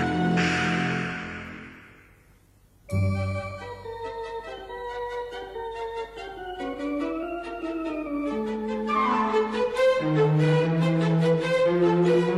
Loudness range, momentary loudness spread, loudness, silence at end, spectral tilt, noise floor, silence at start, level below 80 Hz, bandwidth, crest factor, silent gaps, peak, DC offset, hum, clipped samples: 11 LU; 15 LU; -26 LUFS; 0 s; -7 dB/octave; -58 dBFS; 0 s; -54 dBFS; 11.5 kHz; 14 dB; none; -12 dBFS; under 0.1%; none; under 0.1%